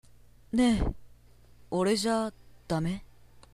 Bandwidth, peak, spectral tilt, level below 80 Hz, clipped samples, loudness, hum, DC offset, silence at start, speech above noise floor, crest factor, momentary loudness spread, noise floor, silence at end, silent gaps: 14 kHz; -14 dBFS; -5.5 dB/octave; -42 dBFS; under 0.1%; -30 LUFS; 60 Hz at -55 dBFS; 0.1%; 0.55 s; 31 dB; 16 dB; 11 LU; -59 dBFS; 0.5 s; none